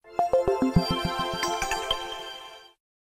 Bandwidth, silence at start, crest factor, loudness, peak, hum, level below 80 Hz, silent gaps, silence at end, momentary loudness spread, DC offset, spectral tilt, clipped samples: 16 kHz; 0.05 s; 18 dB; -27 LUFS; -8 dBFS; none; -44 dBFS; none; 0.4 s; 14 LU; under 0.1%; -4.5 dB/octave; under 0.1%